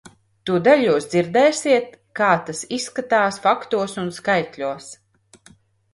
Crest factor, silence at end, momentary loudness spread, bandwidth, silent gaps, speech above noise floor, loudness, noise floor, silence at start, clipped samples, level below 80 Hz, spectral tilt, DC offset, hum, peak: 20 dB; 1 s; 12 LU; 11.5 kHz; none; 34 dB; -20 LUFS; -53 dBFS; 0.45 s; under 0.1%; -64 dBFS; -4.5 dB/octave; under 0.1%; none; -2 dBFS